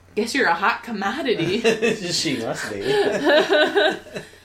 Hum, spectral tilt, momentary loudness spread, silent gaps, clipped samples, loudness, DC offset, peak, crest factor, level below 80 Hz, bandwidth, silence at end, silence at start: none; -3.5 dB/octave; 9 LU; none; under 0.1%; -20 LUFS; under 0.1%; -4 dBFS; 16 dB; -58 dBFS; 16 kHz; 0.15 s; 0.15 s